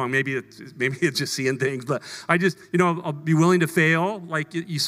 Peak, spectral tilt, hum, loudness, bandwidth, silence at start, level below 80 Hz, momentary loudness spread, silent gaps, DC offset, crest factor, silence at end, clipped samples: -2 dBFS; -5 dB/octave; none; -23 LUFS; 16 kHz; 0 s; -70 dBFS; 10 LU; none; under 0.1%; 20 dB; 0 s; under 0.1%